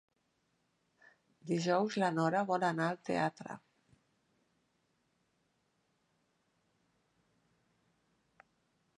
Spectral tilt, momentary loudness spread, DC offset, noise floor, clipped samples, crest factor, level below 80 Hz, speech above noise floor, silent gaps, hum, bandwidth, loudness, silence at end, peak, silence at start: -6 dB/octave; 17 LU; under 0.1%; -79 dBFS; under 0.1%; 22 dB; -84 dBFS; 46 dB; none; none; 11 kHz; -34 LUFS; 5.4 s; -18 dBFS; 1.45 s